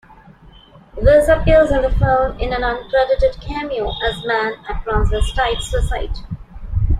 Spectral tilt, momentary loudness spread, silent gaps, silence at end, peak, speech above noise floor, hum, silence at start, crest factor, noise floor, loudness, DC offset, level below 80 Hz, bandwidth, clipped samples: -6 dB/octave; 14 LU; none; 0 s; -2 dBFS; 28 dB; none; 0.95 s; 16 dB; -44 dBFS; -17 LUFS; under 0.1%; -24 dBFS; 14 kHz; under 0.1%